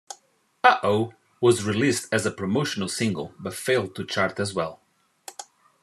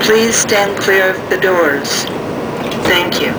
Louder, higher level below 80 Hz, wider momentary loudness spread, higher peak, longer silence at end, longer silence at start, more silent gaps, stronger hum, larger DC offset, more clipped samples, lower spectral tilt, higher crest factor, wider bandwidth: second, -24 LUFS vs -13 LUFS; second, -66 dBFS vs -46 dBFS; first, 20 LU vs 9 LU; about the same, -2 dBFS vs 0 dBFS; first, 0.4 s vs 0 s; about the same, 0.1 s vs 0 s; neither; neither; neither; neither; first, -4.5 dB/octave vs -2.5 dB/octave; first, 24 dB vs 14 dB; second, 13.5 kHz vs over 20 kHz